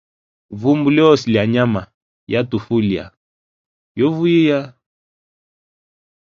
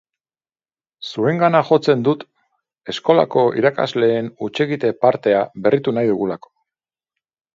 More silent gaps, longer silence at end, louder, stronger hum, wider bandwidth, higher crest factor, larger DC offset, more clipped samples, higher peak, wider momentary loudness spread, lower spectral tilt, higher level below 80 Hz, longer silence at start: first, 1.94-2.27 s, 3.17-3.95 s vs none; first, 1.7 s vs 1.2 s; about the same, -16 LUFS vs -18 LUFS; neither; about the same, 7.4 kHz vs 7.6 kHz; about the same, 18 dB vs 18 dB; neither; neither; about the same, 0 dBFS vs 0 dBFS; about the same, 12 LU vs 11 LU; about the same, -7.5 dB/octave vs -7 dB/octave; first, -52 dBFS vs -64 dBFS; second, 0.5 s vs 1 s